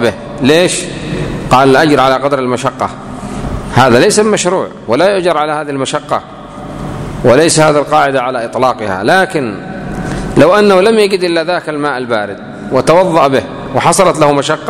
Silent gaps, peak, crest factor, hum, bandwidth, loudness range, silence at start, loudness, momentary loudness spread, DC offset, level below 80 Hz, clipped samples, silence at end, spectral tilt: none; 0 dBFS; 10 dB; none; 15.5 kHz; 2 LU; 0 s; -11 LUFS; 13 LU; under 0.1%; -34 dBFS; 0.7%; 0 s; -4.5 dB/octave